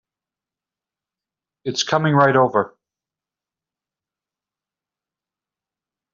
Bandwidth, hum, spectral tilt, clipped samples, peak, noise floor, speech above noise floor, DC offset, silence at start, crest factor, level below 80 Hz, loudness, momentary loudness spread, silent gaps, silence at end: 7.4 kHz; none; -4 dB/octave; under 0.1%; -2 dBFS; -89 dBFS; 72 dB; under 0.1%; 1.65 s; 22 dB; -68 dBFS; -18 LUFS; 14 LU; none; 3.45 s